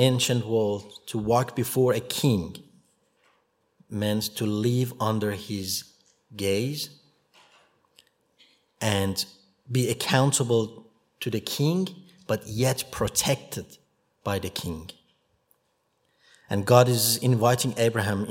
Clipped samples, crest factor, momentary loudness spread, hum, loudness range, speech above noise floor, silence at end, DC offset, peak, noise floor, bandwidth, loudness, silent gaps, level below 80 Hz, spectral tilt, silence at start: under 0.1%; 24 dB; 14 LU; none; 7 LU; 47 dB; 0 s; under 0.1%; -2 dBFS; -72 dBFS; 16.5 kHz; -25 LUFS; none; -58 dBFS; -4.5 dB/octave; 0 s